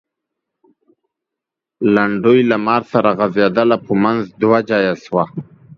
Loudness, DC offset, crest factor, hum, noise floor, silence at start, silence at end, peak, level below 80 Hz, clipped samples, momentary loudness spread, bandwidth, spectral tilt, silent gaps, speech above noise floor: -15 LUFS; under 0.1%; 16 dB; none; -83 dBFS; 1.8 s; 0.05 s; 0 dBFS; -58 dBFS; under 0.1%; 7 LU; 6.8 kHz; -8 dB/octave; none; 69 dB